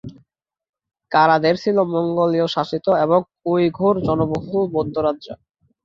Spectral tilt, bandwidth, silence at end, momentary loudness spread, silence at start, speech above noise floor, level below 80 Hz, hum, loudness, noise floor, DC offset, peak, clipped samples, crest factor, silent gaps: -7.5 dB/octave; 7.4 kHz; 0.5 s; 7 LU; 0.05 s; 45 dB; -52 dBFS; none; -19 LUFS; -64 dBFS; under 0.1%; -2 dBFS; under 0.1%; 18 dB; 0.69-0.73 s